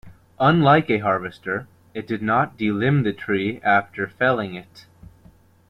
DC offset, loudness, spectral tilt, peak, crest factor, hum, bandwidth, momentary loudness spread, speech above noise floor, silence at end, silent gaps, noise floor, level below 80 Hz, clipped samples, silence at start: under 0.1%; -21 LUFS; -8.5 dB/octave; -2 dBFS; 18 dB; none; 6 kHz; 13 LU; 32 dB; 0.9 s; none; -52 dBFS; -54 dBFS; under 0.1%; 0.05 s